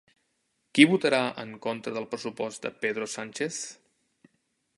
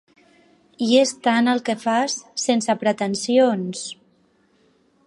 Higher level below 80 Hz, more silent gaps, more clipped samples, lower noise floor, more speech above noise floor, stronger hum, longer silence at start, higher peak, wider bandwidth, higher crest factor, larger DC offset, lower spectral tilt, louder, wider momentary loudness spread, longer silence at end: about the same, -76 dBFS vs -72 dBFS; neither; neither; first, -76 dBFS vs -61 dBFS; first, 48 dB vs 41 dB; neither; about the same, 0.75 s vs 0.8 s; about the same, -2 dBFS vs -4 dBFS; about the same, 11.5 kHz vs 11.5 kHz; first, 28 dB vs 18 dB; neither; about the same, -4 dB/octave vs -3.5 dB/octave; second, -27 LUFS vs -20 LUFS; first, 15 LU vs 11 LU; about the same, 1.05 s vs 1.15 s